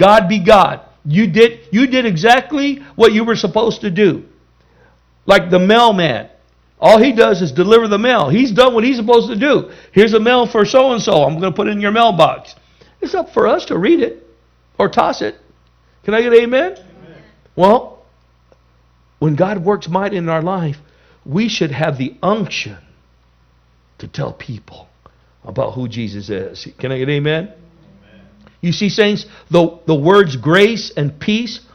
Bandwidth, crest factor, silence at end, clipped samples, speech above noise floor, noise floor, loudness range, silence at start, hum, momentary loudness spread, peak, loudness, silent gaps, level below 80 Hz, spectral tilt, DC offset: 12.5 kHz; 14 dB; 0.15 s; 0.3%; 40 dB; -53 dBFS; 10 LU; 0 s; none; 14 LU; 0 dBFS; -13 LUFS; none; -46 dBFS; -6 dB/octave; under 0.1%